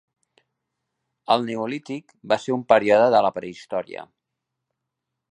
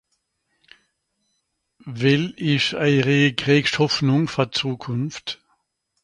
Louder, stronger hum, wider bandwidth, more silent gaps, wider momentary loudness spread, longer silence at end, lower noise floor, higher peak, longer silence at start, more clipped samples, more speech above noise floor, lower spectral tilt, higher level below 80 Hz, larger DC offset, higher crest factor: about the same, -21 LUFS vs -20 LUFS; neither; about the same, 10 kHz vs 10.5 kHz; neither; first, 19 LU vs 12 LU; first, 1.25 s vs 0.7 s; first, -82 dBFS vs -74 dBFS; about the same, -2 dBFS vs -4 dBFS; second, 1.3 s vs 1.85 s; neither; first, 61 dB vs 53 dB; about the same, -5.5 dB/octave vs -5.5 dB/octave; second, -70 dBFS vs -58 dBFS; neither; about the same, 22 dB vs 18 dB